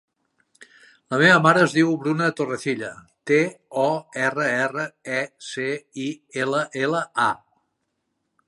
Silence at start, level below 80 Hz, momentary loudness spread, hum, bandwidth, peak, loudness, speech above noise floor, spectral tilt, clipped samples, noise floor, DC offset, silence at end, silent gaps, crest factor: 0.6 s; -70 dBFS; 14 LU; none; 11.5 kHz; -2 dBFS; -22 LUFS; 54 dB; -5 dB/octave; under 0.1%; -76 dBFS; under 0.1%; 1.1 s; none; 22 dB